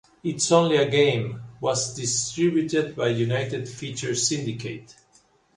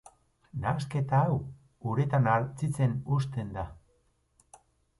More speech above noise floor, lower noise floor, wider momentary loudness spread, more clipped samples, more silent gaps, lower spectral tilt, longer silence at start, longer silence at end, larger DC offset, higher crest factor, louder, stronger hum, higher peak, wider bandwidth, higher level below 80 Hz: second, 37 dB vs 42 dB; second, -61 dBFS vs -70 dBFS; about the same, 13 LU vs 13 LU; neither; neither; second, -4 dB/octave vs -8 dB/octave; second, 0.25 s vs 0.55 s; second, 0.65 s vs 1.25 s; neither; about the same, 20 dB vs 18 dB; first, -24 LUFS vs -30 LUFS; neither; first, -4 dBFS vs -12 dBFS; about the same, 11.5 kHz vs 11.5 kHz; second, -60 dBFS vs -54 dBFS